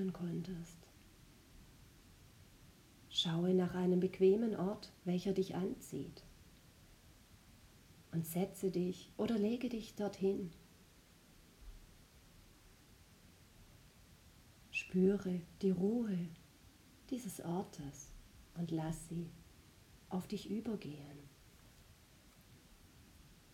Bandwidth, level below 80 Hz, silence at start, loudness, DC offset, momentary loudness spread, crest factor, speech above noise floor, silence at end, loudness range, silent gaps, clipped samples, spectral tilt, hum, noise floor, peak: 16.5 kHz; -66 dBFS; 0 s; -39 LUFS; under 0.1%; 23 LU; 20 dB; 26 dB; 0.2 s; 11 LU; none; under 0.1%; -6.5 dB/octave; none; -64 dBFS; -22 dBFS